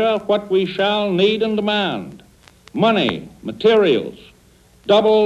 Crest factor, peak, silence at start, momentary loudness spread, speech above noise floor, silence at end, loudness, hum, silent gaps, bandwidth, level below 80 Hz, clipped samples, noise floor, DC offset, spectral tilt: 16 dB; -2 dBFS; 0 s; 16 LU; 34 dB; 0 s; -17 LUFS; none; none; 9.8 kHz; -54 dBFS; under 0.1%; -51 dBFS; under 0.1%; -6.5 dB/octave